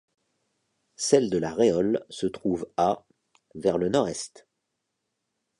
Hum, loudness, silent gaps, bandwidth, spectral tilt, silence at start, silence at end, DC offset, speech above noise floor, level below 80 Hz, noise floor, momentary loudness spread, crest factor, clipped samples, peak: none; -26 LUFS; none; 11.5 kHz; -5 dB/octave; 1 s; 1.3 s; under 0.1%; 56 dB; -60 dBFS; -81 dBFS; 9 LU; 22 dB; under 0.1%; -6 dBFS